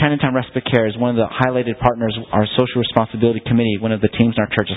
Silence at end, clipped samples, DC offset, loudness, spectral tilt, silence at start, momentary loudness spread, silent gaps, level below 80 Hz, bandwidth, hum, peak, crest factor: 0 s; under 0.1%; under 0.1%; -18 LUFS; -9.5 dB/octave; 0 s; 3 LU; none; -42 dBFS; 4 kHz; none; 0 dBFS; 18 dB